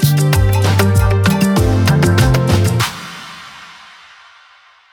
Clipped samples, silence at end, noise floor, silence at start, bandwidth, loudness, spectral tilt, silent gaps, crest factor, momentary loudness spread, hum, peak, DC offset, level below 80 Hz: under 0.1%; 1.2 s; -47 dBFS; 0 s; 18 kHz; -13 LUFS; -6 dB/octave; none; 12 dB; 19 LU; none; 0 dBFS; under 0.1%; -26 dBFS